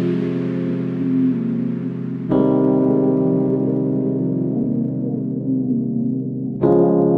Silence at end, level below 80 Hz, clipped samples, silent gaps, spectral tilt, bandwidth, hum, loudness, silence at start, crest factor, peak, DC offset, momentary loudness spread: 0 s; -54 dBFS; under 0.1%; none; -12 dB/octave; 4.1 kHz; none; -19 LUFS; 0 s; 16 dB; -2 dBFS; under 0.1%; 7 LU